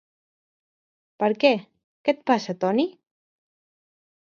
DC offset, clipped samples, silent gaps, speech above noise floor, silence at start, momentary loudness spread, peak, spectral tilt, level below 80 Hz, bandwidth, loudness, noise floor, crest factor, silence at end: under 0.1%; under 0.1%; 1.84-2.04 s; over 68 dB; 1.2 s; 8 LU; -4 dBFS; -5.5 dB/octave; -76 dBFS; 7.2 kHz; -24 LUFS; under -90 dBFS; 22 dB; 1.45 s